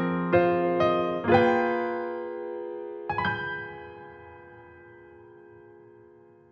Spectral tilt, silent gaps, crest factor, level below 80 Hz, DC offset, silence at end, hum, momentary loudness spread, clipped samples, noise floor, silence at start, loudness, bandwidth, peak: -8 dB/octave; none; 20 dB; -60 dBFS; under 0.1%; 1.15 s; none; 23 LU; under 0.1%; -54 dBFS; 0 s; -26 LUFS; 6.2 kHz; -8 dBFS